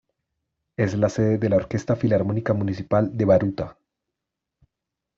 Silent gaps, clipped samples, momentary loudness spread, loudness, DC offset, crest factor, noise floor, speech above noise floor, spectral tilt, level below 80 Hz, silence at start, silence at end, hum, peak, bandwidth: none; under 0.1%; 8 LU; -22 LUFS; under 0.1%; 18 dB; -84 dBFS; 63 dB; -8.5 dB/octave; -54 dBFS; 0.8 s; 1.45 s; none; -6 dBFS; 7.6 kHz